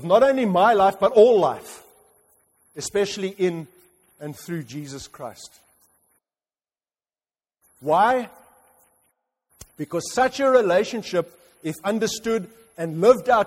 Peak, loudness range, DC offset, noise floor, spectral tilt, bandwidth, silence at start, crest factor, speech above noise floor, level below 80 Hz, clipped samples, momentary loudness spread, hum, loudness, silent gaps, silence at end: -4 dBFS; 17 LU; under 0.1%; under -90 dBFS; -5 dB/octave; 16 kHz; 0 s; 20 dB; over 69 dB; -62 dBFS; under 0.1%; 21 LU; none; -21 LUFS; none; 0 s